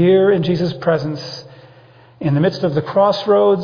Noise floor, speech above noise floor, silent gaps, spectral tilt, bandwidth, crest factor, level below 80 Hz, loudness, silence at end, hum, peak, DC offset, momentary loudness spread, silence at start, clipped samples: -45 dBFS; 30 dB; none; -8 dB/octave; 5.2 kHz; 14 dB; -54 dBFS; -16 LUFS; 0 s; none; -4 dBFS; under 0.1%; 12 LU; 0 s; under 0.1%